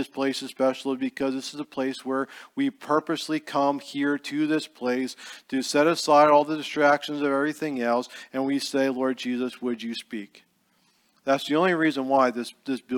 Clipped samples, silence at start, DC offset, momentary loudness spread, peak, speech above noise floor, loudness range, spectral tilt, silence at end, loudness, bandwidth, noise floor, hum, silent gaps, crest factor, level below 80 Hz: under 0.1%; 0 s; under 0.1%; 11 LU; -6 dBFS; 41 dB; 6 LU; -4.5 dB/octave; 0 s; -25 LUFS; 17.5 kHz; -66 dBFS; none; none; 20 dB; -76 dBFS